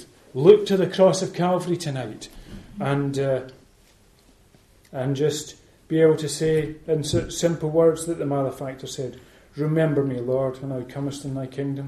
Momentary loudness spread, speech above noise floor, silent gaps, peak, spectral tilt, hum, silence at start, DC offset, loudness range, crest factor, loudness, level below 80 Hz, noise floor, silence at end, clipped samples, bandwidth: 16 LU; 34 dB; none; -2 dBFS; -6 dB/octave; none; 0 s; under 0.1%; 7 LU; 22 dB; -23 LUFS; -52 dBFS; -56 dBFS; 0 s; under 0.1%; 13 kHz